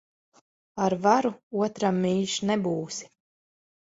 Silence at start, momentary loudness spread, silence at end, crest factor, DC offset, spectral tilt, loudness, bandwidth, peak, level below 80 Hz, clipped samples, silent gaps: 0.75 s; 11 LU; 0.75 s; 20 dB; under 0.1%; -5 dB/octave; -26 LUFS; 8 kHz; -6 dBFS; -68 dBFS; under 0.1%; 1.43-1.51 s